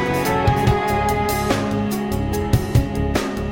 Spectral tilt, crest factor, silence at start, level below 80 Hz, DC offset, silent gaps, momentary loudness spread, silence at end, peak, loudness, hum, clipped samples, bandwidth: -6 dB/octave; 16 dB; 0 s; -30 dBFS; 0.2%; none; 5 LU; 0 s; -4 dBFS; -20 LUFS; none; under 0.1%; 17 kHz